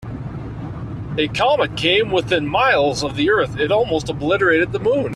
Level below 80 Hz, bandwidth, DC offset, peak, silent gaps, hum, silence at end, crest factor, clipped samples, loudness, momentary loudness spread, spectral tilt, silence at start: -42 dBFS; 12.5 kHz; under 0.1%; -2 dBFS; none; none; 0 s; 18 dB; under 0.1%; -17 LUFS; 14 LU; -5 dB/octave; 0 s